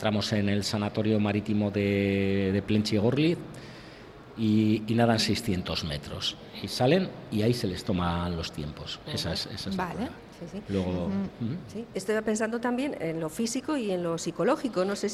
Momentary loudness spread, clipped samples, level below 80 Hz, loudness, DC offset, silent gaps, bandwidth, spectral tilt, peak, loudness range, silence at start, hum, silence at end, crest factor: 12 LU; under 0.1%; -52 dBFS; -28 LUFS; under 0.1%; none; 14.5 kHz; -5.5 dB/octave; -10 dBFS; 6 LU; 0 s; none; 0 s; 18 dB